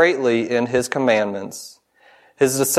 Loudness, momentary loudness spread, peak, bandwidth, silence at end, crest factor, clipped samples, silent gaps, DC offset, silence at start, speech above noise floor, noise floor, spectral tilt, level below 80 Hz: -19 LUFS; 15 LU; 0 dBFS; 16 kHz; 0 s; 18 dB; under 0.1%; none; under 0.1%; 0 s; 35 dB; -53 dBFS; -3.5 dB/octave; -62 dBFS